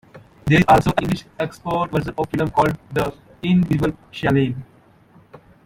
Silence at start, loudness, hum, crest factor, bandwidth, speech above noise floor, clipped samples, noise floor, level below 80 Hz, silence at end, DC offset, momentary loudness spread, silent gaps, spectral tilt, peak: 0.15 s; -20 LUFS; none; 18 dB; 16.5 kHz; 32 dB; under 0.1%; -51 dBFS; -42 dBFS; 0.3 s; under 0.1%; 12 LU; none; -7 dB/octave; -2 dBFS